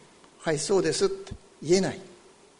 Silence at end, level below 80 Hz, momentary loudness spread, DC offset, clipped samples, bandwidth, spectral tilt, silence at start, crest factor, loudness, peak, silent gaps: 0.5 s; -54 dBFS; 15 LU; under 0.1%; under 0.1%; 10.5 kHz; -4.5 dB/octave; 0.4 s; 18 dB; -26 LUFS; -10 dBFS; none